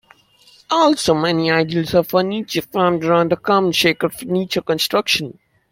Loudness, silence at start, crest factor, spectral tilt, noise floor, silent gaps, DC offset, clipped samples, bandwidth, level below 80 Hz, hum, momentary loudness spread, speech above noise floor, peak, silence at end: -17 LUFS; 0.7 s; 16 dB; -4.5 dB/octave; -51 dBFS; none; under 0.1%; under 0.1%; 16.5 kHz; -54 dBFS; none; 6 LU; 34 dB; -2 dBFS; 0.4 s